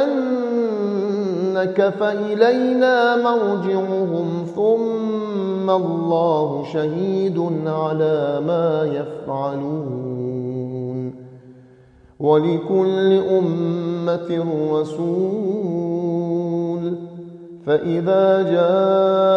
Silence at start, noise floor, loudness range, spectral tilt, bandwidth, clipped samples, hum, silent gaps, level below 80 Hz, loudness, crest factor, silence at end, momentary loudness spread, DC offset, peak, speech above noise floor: 0 s; -49 dBFS; 5 LU; -8.5 dB/octave; 7.2 kHz; under 0.1%; none; none; -64 dBFS; -20 LUFS; 18 dB; 0 s; 10 LU; under 0.1%; -2 dBFS; 30 dB